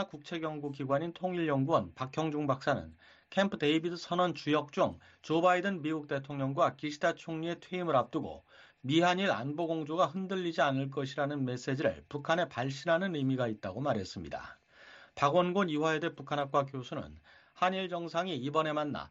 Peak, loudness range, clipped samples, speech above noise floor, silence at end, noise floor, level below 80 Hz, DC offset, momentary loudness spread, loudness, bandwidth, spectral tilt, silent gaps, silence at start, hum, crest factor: -14 dBFS; 2 LU; under 0.1%; 24 dB; 0.05 s; -57 dBFS; -68 dBFS; under 0.1%; 10 LU; -33 LUFS; 8 kHz; -6 dB/octave; none; 0 s; none; 20 dB